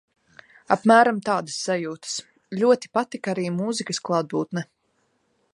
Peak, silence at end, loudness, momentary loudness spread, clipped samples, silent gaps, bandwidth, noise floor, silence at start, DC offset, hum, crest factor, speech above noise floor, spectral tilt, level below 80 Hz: -2 dBFS; 0.9 s; -23 LUFS; 14 LU; under 0.1%; none; 11.5 kHz; -69 dBFS; 0.7 s; under 0.1%; none; 22 dB; 47 dB; -4.5 dB/octave; -74 dBFS